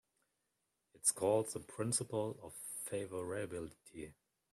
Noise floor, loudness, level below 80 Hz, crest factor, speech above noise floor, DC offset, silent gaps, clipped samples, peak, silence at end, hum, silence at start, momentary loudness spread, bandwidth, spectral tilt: -85 dBFS; -39 LUFS; -74 dBFS; 22 dB; 46 dB; under 0.1%; none; under 0.1%; -18 dBFS; 0.4 s; none; 0.95 s; 17 LU; 15 kHz; -4 dB/octave